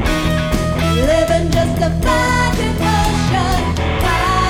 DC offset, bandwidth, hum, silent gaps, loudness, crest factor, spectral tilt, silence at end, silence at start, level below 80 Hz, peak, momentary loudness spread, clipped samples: under 0.1%; 17 kHz; none; none; -16 LUFS; 12 dB; -5.5 dB/octave; 0 s; 0 s; -22 dBFS; -2 dBFS; 3 LU; under 0.1%